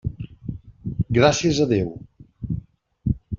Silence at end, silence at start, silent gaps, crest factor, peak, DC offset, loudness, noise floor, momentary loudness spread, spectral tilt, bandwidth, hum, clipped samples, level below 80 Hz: 0 s; 0.05 s; none; 20 dB; -4 dBFS; under 0.1%; -22 LUFS; -40 dBFS; 18 LU; -5.5 dB/octave; 7.6 kHz; none; under 0.1%; -40 dBFS